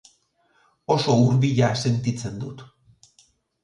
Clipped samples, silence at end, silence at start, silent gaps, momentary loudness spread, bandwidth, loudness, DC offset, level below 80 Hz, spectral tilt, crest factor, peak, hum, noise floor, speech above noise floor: under 0.1%; 1 s; 0.9 s; none; 18 LU; 10.5 kHz; -21 LUFS; under 0.1%; -56 dBFS; -6.5 dB/octave; 16 dB; -6 dBFS; none; -65 dBFS; 44 dB